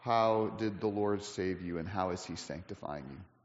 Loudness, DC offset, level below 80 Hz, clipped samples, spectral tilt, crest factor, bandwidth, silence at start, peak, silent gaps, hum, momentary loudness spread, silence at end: -35 LUFS; under 0.1%; -66 dBFS; under 0.1%; -5 dB/octave; 18 dB; 8 kHz; 0 s; -18 dBFS; none; none; 13 LU; 0.2 s